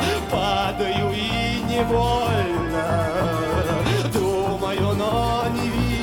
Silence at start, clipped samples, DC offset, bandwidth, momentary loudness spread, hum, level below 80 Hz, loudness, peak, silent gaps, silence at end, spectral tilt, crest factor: 0 s; under 0.1%; 0.2%; 18.5 kHz; 2 LU; none; -34 dBFS; -22 LUFS; -8 dBFS; none; 0 s; -5.5 dB/octave; 14 dB